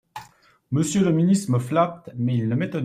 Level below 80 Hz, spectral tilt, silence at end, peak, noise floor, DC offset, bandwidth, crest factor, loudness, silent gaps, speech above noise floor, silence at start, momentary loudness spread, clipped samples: -60 dBFS; -6.5 dB/octave; 0 s; -6 dBFS; -53 dBFS; under 0.1%; 14.5 kHz; 16 dB; -22 LUFS; none; 32 dB; 0.15 s; 8 LU; under 0.1%